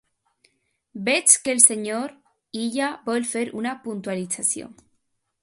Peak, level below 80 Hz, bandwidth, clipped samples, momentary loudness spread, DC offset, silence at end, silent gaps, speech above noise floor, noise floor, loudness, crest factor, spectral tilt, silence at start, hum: 0 dBFS; -70 dBFS; 16 kHz; under 0.1%; 15 LU; under 0.1%; 0.7 s; none; 49 dB; -72 dBFS; -21 LUFS; 24 dB; -1.5 dB/octave; 0.95 s; none